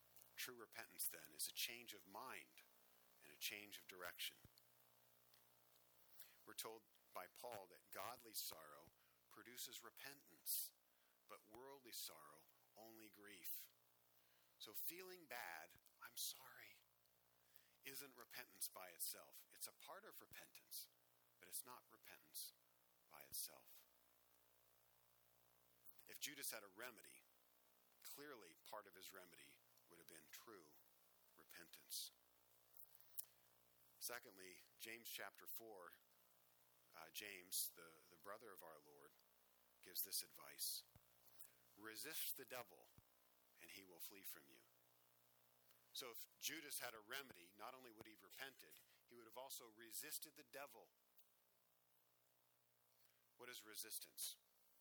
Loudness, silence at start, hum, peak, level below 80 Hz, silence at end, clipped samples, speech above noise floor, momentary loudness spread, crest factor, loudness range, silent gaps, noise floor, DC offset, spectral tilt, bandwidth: -54 LUFS; 0 s; none; -30 dBFS; under -90 dBFS; 0 s; under 0.1%; 26 dB; 17 LU; 28 dB; 7 LU; none; -82 dBFS; under 0.1%; 0 dB/octave; over 20 kHz